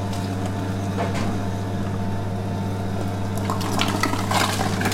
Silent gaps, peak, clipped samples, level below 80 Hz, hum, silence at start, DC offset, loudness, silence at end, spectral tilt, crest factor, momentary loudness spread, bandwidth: none; -2 dBFS; under 0.1%; -42 dBFS; none; 0 s; under 0.1%; -24 LUFS; 0 s; -5 dB/octave; 20 dB; 6 LU; 16.5 kHz